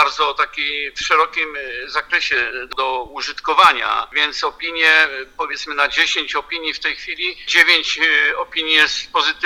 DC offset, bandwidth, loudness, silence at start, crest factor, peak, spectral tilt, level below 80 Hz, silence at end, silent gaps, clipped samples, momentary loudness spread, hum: under 0.1%; over 20 kHz; -16 LUFS; 0 s; 18 dB; 0 dBFS; 0 dB/octave; -50 dBFS; 0 s; none; under 0.1%; 11 LU; none